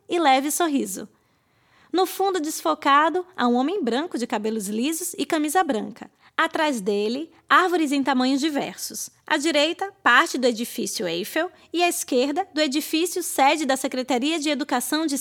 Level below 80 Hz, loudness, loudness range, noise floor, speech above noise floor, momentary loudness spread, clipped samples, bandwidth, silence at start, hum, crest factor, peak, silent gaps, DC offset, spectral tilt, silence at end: -74 dBFS; -22 LUFS; 3 LU; -64 dBFS; 41 dB; 9 LU; under 0.1%; 19 kHz; 0.1 s; none; 20 dB; -4 dBFS; none; under 0.1%; -2.5 dB/octave; 0 s